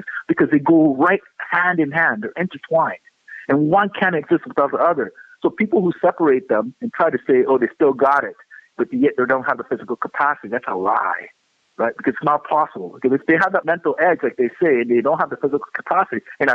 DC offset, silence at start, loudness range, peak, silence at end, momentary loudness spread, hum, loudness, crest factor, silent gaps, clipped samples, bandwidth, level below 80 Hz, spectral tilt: under 0.1%; 0 s; 3 LU; -2 dBFS; 0 s; 8 LU; none; -19 LUFS; 16 dB; none; under 0.1%; 6.4 kHz; -66 dBFS; -8.5 dB/octave